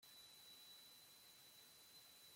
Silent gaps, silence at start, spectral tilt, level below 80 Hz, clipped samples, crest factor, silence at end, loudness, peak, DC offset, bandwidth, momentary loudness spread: none; 0 s; 0 dB/octave; under -90 dBFS; under 0.1%; 12 dB; 0 s; -62 LUFS; -52 dBFS; under 0.1%; 16.5 kHz; 3 LU